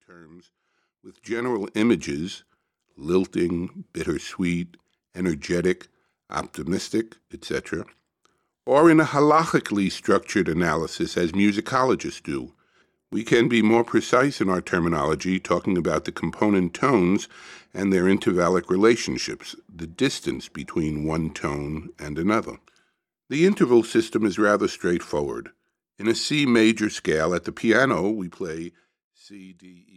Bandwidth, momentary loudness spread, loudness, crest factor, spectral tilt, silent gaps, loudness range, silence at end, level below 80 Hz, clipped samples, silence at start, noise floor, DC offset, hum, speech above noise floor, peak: 13 kHz; 15 LU; -23 LUFS; 18 dB; -5.5 dB/octave; 29.04-29.11 s; 7 LU; 0.25 s; -52 dBFS; under 0.1%; 0.2 s; -71 dBFS; under 0.1%; none; 48 dB; -6 dBFS